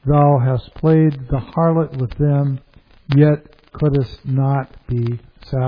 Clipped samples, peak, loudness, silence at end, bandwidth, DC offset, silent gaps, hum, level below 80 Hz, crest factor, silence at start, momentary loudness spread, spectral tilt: under 0.1%; 0 dBFS; -18 LUFS; 0 s; 5.2 kHz; under 0.1%; none; none; -38 dBFS; 16 dB; 0.05 s; 10 LU; -11.5 dB/octave